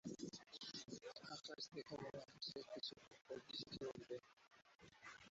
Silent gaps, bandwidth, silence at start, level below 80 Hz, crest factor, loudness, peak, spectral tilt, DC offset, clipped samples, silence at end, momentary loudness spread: 4.33-4.37 s, 4.75-4.79 s; 8 kHz; 0.05 s; -82 dBFS; 16 dB; -53 LUFS; -38 dBFS; -3 dB/octave; under 0.1%; under 0.1%; 0 s; 10 LU